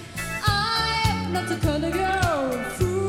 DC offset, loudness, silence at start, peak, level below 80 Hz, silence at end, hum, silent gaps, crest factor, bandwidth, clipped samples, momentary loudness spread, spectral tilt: under 0.1%; -24 LUFS; 0 s; -6 dBFS; -38 dBFS; 0 s; none; none; 18 dB; 17 kHz; under 0.1%; 5 LU; -4.5 dB/octave